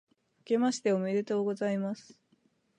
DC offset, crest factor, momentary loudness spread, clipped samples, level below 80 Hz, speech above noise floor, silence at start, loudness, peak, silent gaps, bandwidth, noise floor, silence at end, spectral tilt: under 0.1%; 16 dB; 7 LU; under 0.1%; -84 dBFS; 41 dB; 0.5 s; -31 LUFS; -16 dBFS; none; 10.5 kHz; -71 dBFS; 0.75 s; -6 dB/octave